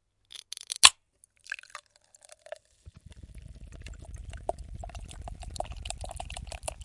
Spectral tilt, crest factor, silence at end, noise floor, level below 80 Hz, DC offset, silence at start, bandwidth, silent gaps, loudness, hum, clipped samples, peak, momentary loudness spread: 0 dB/octave; 34 dB; 0 s; -65 dBFS; -46 dBFS; under 0.1%; 0.35 s; 12 kHz; none; -26 LUFS; none; under 0.1%; 0 dBFS; 29 LU